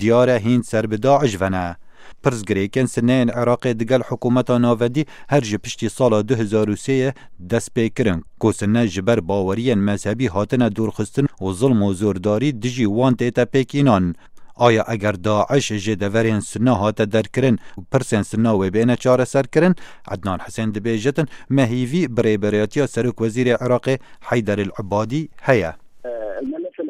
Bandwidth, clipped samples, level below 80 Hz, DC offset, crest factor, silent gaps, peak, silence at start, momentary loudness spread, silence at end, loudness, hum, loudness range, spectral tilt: 13.5 kHz; under 0.1%; -50 dBFS; under 0.1%; 18 dB; none; 0 dBFS; 0 s; 8 LU; 0 s; -19 LUFS; none; 2 LU; -6.5 dB/octave